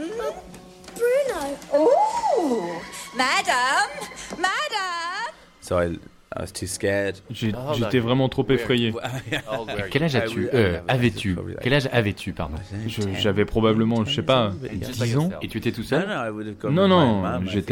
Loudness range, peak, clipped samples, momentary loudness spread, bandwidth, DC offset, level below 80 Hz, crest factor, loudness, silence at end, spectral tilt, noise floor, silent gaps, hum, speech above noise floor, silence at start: 4 LU; -6 dBFS; under 0.1%; 11 LU; 17.5 kHz; under 0.1%; -46 dBFS; 16 dB; -23 LUFS; 0 s; -5.5 dB/octave; -43 dBFS; none; none; 20 dB; 0 s